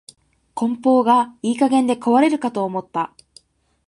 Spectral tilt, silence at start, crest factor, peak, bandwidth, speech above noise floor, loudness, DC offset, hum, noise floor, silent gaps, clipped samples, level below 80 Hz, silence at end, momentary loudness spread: -5.5 dB/octave; 0.55 s; 16 dB; -2 dBFS; 11 kHz; 43 dB; -19 LUFS; under 0.1%; none; -61 dBFS; none; under 0.1%; -66 dBFS; 0.8 s; 11 LU